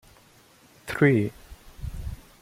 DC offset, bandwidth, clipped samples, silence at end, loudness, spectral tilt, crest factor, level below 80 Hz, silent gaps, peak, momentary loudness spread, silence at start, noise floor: under 0.1%; 16 kHz; under 0.1%; 0.2 s; -25 LUFS; -7.5 dB/octave; 22 dB; -44 dBFS; none; -6 dBFS; 19 LU; 0.85 s; -56 dBFS